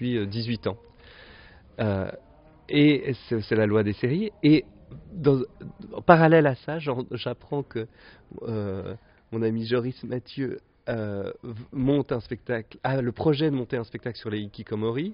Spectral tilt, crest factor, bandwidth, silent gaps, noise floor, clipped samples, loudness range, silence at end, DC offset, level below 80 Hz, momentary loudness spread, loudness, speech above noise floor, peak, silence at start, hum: -6 dB/octave; 26 dB; 5.4 kHz; none; -50 dBFS; under 0.1%; 8 LU; 0 s; under 0.1%; -54 dBFS; 16 LU; -26 LUFS; 25 dB; 0 dBFS; 0 s; none